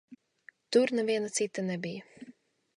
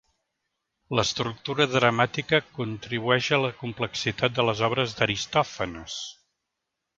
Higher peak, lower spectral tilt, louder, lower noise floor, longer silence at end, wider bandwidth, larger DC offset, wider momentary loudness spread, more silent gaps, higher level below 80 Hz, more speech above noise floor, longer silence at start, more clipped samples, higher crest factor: second, -12 dBFS vs -4 dBFS; about the same, -4 dB/octave vs -4.5 dB/octave; second, -30 LUFS vs -25 LUFS; second, -60 dBFS vs -83 dBFS; second, 0.45 s vs 0.85 s; first, 11.5 kHz vs 7.8 kHz; neither; first, 20 LU vs 11 LU; neither; second, -82 dBFS vs -56 dBFS; second, 30 dB vs 57 dB; second, 0.1 s vs 0.9 s; neither; about the same, 20 dB vs 22 dB